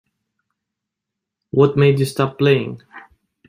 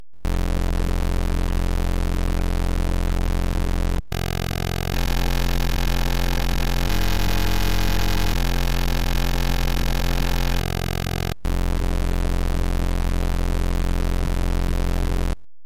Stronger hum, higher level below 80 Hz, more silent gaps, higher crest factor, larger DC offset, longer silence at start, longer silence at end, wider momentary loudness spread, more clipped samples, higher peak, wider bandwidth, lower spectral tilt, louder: neither; second, -58 dBFS vs -24 dBFS; neither; first, 18 dB vs 10 dB; second, under 0.1% vs 5%; first, 1.55 s vs 0 s; first, 0.5 s vs 0 s; first, 13 LU vs 2 LU; neither; first, -2 dBFS vs -10 dBFS; about the same, 15.5 kHz vs 16.5 kHz; first, -7 dB/octave vs -5 dB/octave; first, -17 LUFS vs -25 LUFS